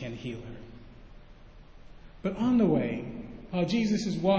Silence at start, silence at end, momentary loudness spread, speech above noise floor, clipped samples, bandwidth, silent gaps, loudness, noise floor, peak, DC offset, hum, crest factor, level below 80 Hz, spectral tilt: 0 s; 0 s; 19 LU; 23 dB; under 0.1%; 8 kHz; none; -29 LUFS; -50 dBFS; -12 dBFS; under 0.1%; none; 18 dB; -52 dBFS; -7 dB/octave